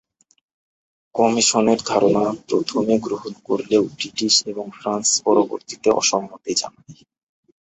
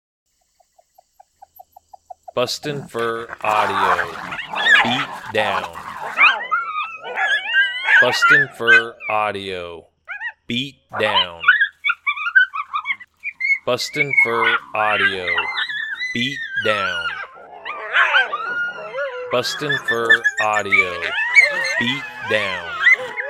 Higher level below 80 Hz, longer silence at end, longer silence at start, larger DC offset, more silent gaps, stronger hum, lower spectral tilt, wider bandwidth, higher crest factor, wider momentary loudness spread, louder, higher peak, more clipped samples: about the same, -60 dBFS vs -62 dBFS; first, 0.7 s vs 0 s; second, 1.15 s vs 2.35 s; neither; neither; neither; about the same, -3 dB/octave vs -2.5 dB/octave; second, 8.4 kHz vs 16 kHz; about the same, 20 dB vs 20 dB; second, 10 LU vs 13 LU; about the same, -19 LUFS vs -17 LUFS; about the same, -2 dBFS vs 0 dBFS; neither